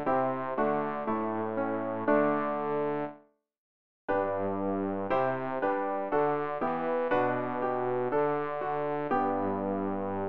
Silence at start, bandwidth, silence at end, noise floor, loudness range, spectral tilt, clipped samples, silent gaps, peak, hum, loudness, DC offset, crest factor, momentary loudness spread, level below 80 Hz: 0 s; 5.4 kHz; 0 s; -56 dBFS; 2 LU; -9.5 dB/octave; under 0.1%; 3.58-4.08 s; -14 dBFS; none; -30 LUFS; 0.4%; 16 dB; 4 LU; -66 dBFS